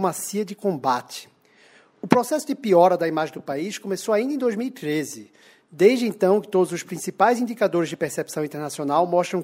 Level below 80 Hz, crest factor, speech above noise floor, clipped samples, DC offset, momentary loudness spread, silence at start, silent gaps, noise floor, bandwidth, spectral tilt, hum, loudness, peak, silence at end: -72 dBFS; 22 dB; 33 dB; under 0.1%; under 0.1%; 11 LU; 0 s; none; -55 dBFS; 16 kHz; -5 dB/octave; none; -22 LUFS; 0 dBFS; 0 s